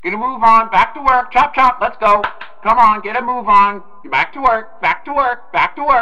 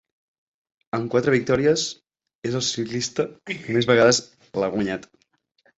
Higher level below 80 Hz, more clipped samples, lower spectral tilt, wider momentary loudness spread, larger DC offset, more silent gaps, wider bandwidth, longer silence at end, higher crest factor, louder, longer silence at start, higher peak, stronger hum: first, -42 dBFS vs -58 dBFS; neither; about the same, -4.5 dB/octave vs -4 dB/octave; second, 8 LU vs 15 LU; neither; second, none vs 2.35-2.42 s; about the same, 8.8 kHz vs 8.2 kHz; second, 0 s vs 0.75 s; second, 14 dB vs 20 dB; first, -14 LUFS vs -22 LUFS; second, 0 s vs 0.95 s; first, 0 dBFS vs -4 dBFS; neither